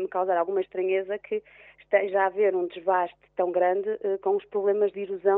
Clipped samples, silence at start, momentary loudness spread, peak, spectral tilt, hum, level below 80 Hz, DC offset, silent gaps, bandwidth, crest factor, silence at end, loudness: under 0.1%; 0 s; 7 LU; -8 dBFS; -3.5 dB/octave; none; -72 dBFS; under 0.1%; none; 3.9 kHz; 18 dB; 0 s; -26 LUFS